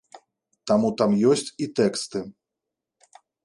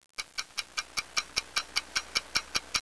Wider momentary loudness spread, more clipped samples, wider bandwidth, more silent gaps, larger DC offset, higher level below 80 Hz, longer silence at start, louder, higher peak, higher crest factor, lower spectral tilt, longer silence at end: first, 14 LU vs 5 LU; neither; about the same, 11.5 kHz vs 11 kHz; neither; second, under 0.1% vs 0.2%; about the same, -64 dBFS vs -60 dBFS; about the same, 0.15 s vs 0.2 s; first, -23 LUFS vs -32 LUFS; about the same, -6 dBFS vs -8 dBFS; second, 20 dB vs 26 dB; first, -5.5 dB/octave vs 1 dB/octave; first, 1.15 s vs 0 s